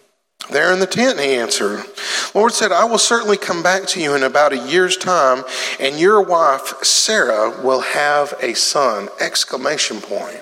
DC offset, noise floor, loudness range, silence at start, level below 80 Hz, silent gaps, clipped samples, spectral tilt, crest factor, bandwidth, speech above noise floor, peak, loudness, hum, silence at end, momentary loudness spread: under 0.1%; -38 dBFS; 1 LU; 0.4 s; -74 dBFS; none; under 0.1%; -1.5 dB/octave; 14 dB; 16.5 kHz; 22 dB; -2 dBFS; -15 LUFS; none; 0 s; 7 LU